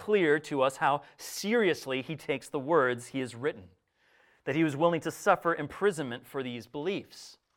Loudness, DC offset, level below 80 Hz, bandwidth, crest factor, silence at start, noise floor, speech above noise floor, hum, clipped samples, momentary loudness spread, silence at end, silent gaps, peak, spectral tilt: -30 LUFS; under 0.1%; -72 dBFS; 17.5 kHz; 20 dB; 0 s; -67 dBFS; 38 dB; none; under 0.1%; 11 LU; 0.25 s; none; -10 dBFS; -5 dB/octave